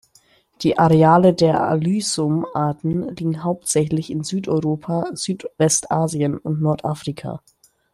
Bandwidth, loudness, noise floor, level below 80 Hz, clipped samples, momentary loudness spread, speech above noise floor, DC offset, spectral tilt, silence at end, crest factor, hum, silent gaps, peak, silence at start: 13 kHz; -19 LUFS; -57 dBFS; -54 dBFS; under 0.1%; 12 LU; 38 dB; under 0.1%; -5.5 dB/octave; 0.55 s; 18 dB; none; none; -2 dBFS; 0.6 s